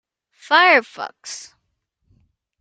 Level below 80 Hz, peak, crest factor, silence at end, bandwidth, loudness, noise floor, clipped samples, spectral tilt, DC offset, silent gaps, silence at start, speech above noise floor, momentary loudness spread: -72 dBFS; 0 dBFS; 20 dB; 1.2 s; 9.4 kHz; -14 LUFS; -73 dBFS; under 0.1%; -0.5 dB/octave; under 0.1%; none; 0.5 s; 55 dB; 21 LU